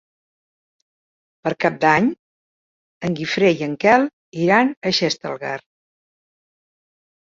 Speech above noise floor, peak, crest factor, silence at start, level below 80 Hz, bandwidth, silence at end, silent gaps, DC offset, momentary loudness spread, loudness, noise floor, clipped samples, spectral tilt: over 72 dB; -2 dBFS; 20 dB; 1.45 s; -62 dBFS; 7.8 kHz; 1.7 s; 2.19-3.01 s, 4.13-4.32 s, 4.77-4.81 s; under 0.1%; 12 LU; -19 LUFS; under -90 dBFS; under 0.1%; -5 dB/octave